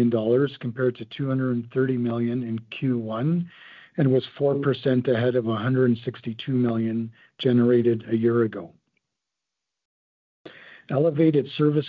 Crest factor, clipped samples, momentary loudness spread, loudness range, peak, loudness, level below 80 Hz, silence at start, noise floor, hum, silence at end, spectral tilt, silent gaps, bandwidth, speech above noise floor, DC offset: 16 dB; under 0.1%; 8 LU; 4 LU; -8 dBFS; -24 LUFS; -66 dBFS; 0 s; -85 dBFS; none; 0 s; -10.5 dB/octave; 9.85-10.45 s; 5 kHz; 62 dB; under 0.1%